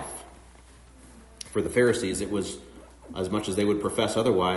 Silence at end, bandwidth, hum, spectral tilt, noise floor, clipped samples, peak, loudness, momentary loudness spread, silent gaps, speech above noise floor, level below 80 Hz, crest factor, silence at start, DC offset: 0 s; 11.5 kHz; none; -4.5 dB/octave; -51 dBFS; under 0.1%; -10 dBFS; -27 LUFS; 17 LU; none; 26 dB; -52 dBFS; 18 dB; 0 s; under 0.1%